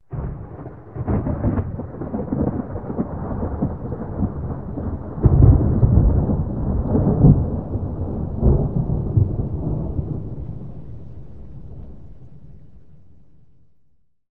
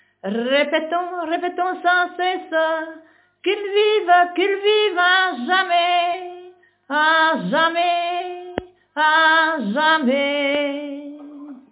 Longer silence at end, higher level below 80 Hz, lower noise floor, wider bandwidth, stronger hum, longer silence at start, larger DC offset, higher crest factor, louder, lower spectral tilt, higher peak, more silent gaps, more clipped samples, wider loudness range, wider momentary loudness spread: second, 0 s vs 0.15 s; first, -26 dBFS vs -66 dBFS; first, -61 dBFS vs -46 dBFS; second, 2.3 kHz vs 4 kHz; second, none vs 50 Hz at -80 dBFS; second, 0 s vs 0.25 s; first, 0.9% vs under 0.1%; about the same, 20 dB vs 16 dB; second, -21 LUFS vs -18 LUFS; first, -14.5 dB/octave vs -7.5 dB/octave; first, 0 dBFS vs -4 dBFS; neither; neither; first, 14 LU vs 4 LU; first, 22 LU vs 16 LU